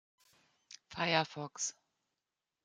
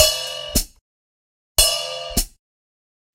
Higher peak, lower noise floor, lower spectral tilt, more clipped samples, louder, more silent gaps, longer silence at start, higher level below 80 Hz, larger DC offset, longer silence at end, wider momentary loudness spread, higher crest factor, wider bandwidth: second, -14 dBFS vs 0 dBFS; about the same, under -90 dBFS vs under -90 dBFS; first, -2.5 dB/octave vs -1 dB/octave; neither; second, -35 LUFS vs -20 LUFS; second, none vs 0.81-1.55 s; first, 0.7 s vs 0 s; second, -78 dBFS vs -34 dBFS; neither; about the same, 0.95 s vs 0.85 s; first, 22 LU vs 11 LU; about the same, 28 dB vs 24 dB; second, 10.5 kHz vs 16 kHz